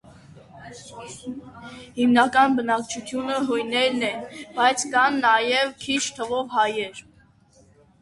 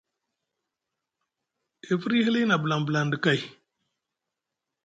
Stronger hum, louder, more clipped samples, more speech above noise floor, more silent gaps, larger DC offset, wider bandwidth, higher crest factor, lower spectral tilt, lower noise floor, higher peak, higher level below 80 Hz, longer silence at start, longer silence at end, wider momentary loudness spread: neither; first, -22 LUFS vs -25 LUFS; neither; second, 33 dB vs 62 dB; neither; neither; first, 11.5 kHz vs 8 kHz; about the same, 20 dB vs 22 dB; second, -2.5 dB/octave vs -6 dB/octave; second, -56 dBFS vs -86 dBFS; first, -4 dBFS vs -8 dBFS; first, -62 dBFS vs -70 dBFS; second, 0.35 s vs 1.85 s; second, 1 s vs 1.35 s; first, 21 LU vs 7 LU